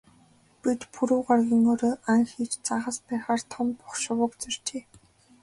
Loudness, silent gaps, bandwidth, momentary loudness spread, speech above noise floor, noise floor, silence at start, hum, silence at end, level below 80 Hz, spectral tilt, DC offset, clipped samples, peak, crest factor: -27 LUFS; none; 11.5 kHz; 10 LU; 34 dB; -60 dBFS; 0.65 s; none; 0.65 s; -66 dBFS; -4 dB/octave; under 0.1%; under 0.1%; -10 dBFS; 18 dB